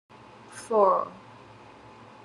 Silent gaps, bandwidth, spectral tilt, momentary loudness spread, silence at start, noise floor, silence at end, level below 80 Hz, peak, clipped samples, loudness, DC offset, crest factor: none; 12 kHz; -5.5 dB/octave; 24 LU; 0.5 s; -49 dBFS; 1.1 s; -72 dBFS; -10 dBFS; under 0.1%; -24 LUFS; under 0.1%; 20 dB